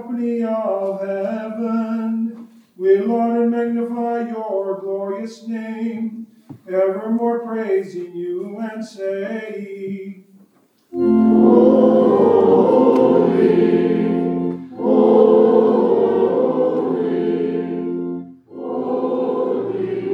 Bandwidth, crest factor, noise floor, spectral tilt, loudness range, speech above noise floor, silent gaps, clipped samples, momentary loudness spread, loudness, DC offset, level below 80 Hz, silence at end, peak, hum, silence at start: 6.8 kHz; 16 dB; -56 dBFS; -9 dB/octave; 10 LU; 37 dB; none; under 0.1%; 15 LU; -18 LUFS; under 0.1%; -64 dBFS; 0 s; 0 dBFS; none; 0 s